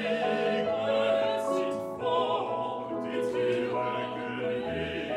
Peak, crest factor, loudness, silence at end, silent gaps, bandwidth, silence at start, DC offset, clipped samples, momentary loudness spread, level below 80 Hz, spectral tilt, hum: -16 dBFS; 14 dB; -30 LUFS; 0 s; none; 13 kHz; 0 s; under 0.1%; under 0.1%; 6 LU; -62 dBFS; -5.5 dB/octave; none